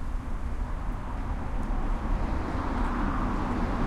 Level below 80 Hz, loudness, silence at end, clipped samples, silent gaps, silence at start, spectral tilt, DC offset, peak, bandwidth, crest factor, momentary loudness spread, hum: -30 dBFS; -32 LUFS; 0 s; under 0.1%; none; 0 s; -7.5 dB/octave; under 0.1%; -16 dBFS; 8.8 kHz; 12 dB; 6 LU; none